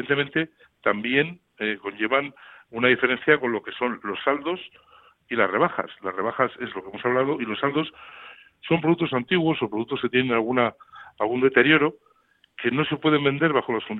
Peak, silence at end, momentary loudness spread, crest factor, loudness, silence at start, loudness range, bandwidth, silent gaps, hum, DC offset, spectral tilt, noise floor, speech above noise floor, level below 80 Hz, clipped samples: -4 dBFS; 0 s; 11 LU; 20 dB; -23 LUFS; 0 s; 4 LU; 4.1 kHz; none; none; under 0.1%; -9 dB/octave; -63 dBFS; 39 dB; -64 dBFS; under 0.1%